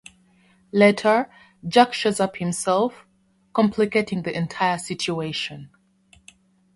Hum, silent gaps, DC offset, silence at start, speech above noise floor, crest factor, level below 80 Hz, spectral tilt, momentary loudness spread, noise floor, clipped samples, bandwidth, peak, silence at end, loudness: none; none; under 0.1%; 0.75 s; 41 dB; 22 dB; -62 dBFS; -4.5 dB/octave; 11 LU; -62 dBFS; under 0.1%; 11.5 kHz; -2 dBFS; 1.1 s; -22 LUFS